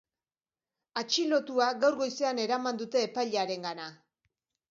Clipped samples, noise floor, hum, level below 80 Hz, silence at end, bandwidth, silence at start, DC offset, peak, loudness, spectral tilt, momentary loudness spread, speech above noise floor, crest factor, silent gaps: under 0.1%; under -90 dBFS; none; -84 dBFS; 0.75 s; 7.6 kHz; 0.95 s; under 0.1%; -12 dBFS; -30 LUFS; -3 dB/octave; 11 LU; over 60 dB; 20 dB; none